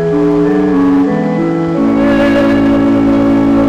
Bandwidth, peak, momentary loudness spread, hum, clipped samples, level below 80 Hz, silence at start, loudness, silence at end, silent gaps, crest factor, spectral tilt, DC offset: 7.8 kHz; -6 dBFS; 4 LU; none; under 0.1%; -34 dBFS; 0 s; -10 LUFS; 0 s; none; 4 dB; -8 dB/octave; under 0.1%